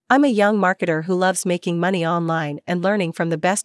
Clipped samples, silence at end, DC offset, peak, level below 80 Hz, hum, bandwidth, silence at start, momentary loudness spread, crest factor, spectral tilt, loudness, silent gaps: under 0.1%; 0 s; under 0.1%; -4 dBFS; -78 dBFS; none; 12 kHz; 0.1 s; 6 LU; 16 dB; -5 dB/octave; -20 LUFS; none